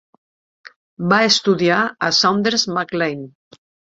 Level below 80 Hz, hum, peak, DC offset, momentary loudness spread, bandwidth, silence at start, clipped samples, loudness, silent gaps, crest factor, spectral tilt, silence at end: -62 dBFS; none; 0 dBFS; under 0.1%; 11 LU; 7.8 kHz; 0.65 s; under 0.1%; -16 LUFS; 0.76-0.97 s; 18 dB; -3.5 dB/octave; 0.6 s